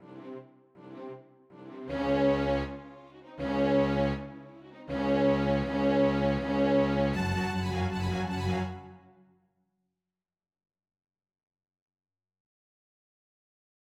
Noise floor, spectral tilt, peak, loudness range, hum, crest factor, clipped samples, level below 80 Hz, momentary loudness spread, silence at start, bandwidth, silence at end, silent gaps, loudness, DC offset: under -90 dBFS; -7.5 dB/octave; -16 dBFS; 8 LU; none; 16 dB; under 0.1%; -48 dBFS; 21 LU; 0 s; 11.5 kHz; 4.95 s; none; -29 LUFS; under 0.1%